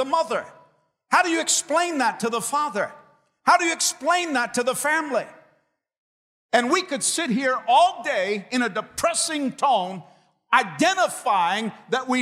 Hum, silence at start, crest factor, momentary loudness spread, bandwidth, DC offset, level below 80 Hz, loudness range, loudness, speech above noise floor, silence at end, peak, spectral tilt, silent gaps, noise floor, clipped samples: none; 0 s; 20 dB; 8 LU; 16 kHz; under 0.1%; -68 dBFS; 2 LU; -22 LUFS; 45 dB; 0 s; -4 dBFS; -2 dB/octave; 5.98-6.49 s; -67 dBFS; under 0.1%